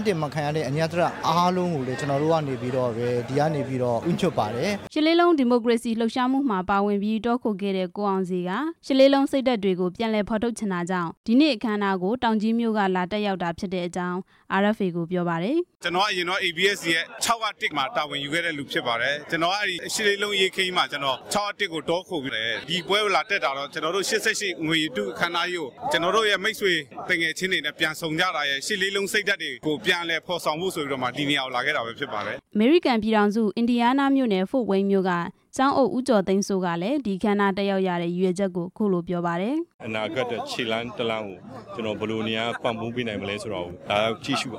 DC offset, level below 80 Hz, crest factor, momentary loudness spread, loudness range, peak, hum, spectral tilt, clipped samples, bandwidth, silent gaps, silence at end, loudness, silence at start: under 0.1%; -60 dBFS; 18 dB; 7 LU; 4 LU; -6 dBFS; none; -4.5 dB/octave; under 0.1%; 16 kHz; 11.17-11.24 s, 39.74-39.79 s; 0 s; -24 LUFS; 0 s